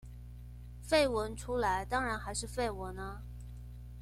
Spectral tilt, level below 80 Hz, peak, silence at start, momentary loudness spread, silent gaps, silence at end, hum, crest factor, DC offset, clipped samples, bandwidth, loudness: -4 dB/octave; -46 dBFS; -16 dBFS; 0 s; 21 LU; none; 0 s; 60 Hz at -45 dBFS; 20 dB; under 0.1%; under 0.1%; 16 kHz; -34 LUFS